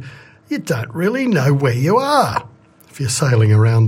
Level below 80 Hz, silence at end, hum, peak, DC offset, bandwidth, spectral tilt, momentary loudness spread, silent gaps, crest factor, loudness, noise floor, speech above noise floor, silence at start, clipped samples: -52 dBFS; 0 s; none; -2 dBFS; under 0.1%; 15.5 kHz; -6 dB/octave; 12 LU; none; 14 dB; -16 LUFS; -38 dBFS; 23 dB; 0 s; under 0.1%